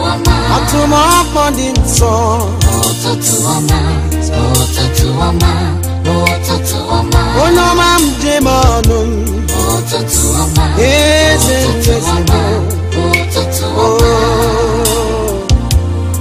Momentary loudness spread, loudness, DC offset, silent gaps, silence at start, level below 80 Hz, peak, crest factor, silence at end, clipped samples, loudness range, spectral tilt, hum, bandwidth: 6 LU; -11 LUFS; under 0.1%; none; 0 s; -18 dBFS; 0 dBFS; 10 dB; 0 s; 0.1%; 2 LU; -4.5 dB/octave; none; 16 kHz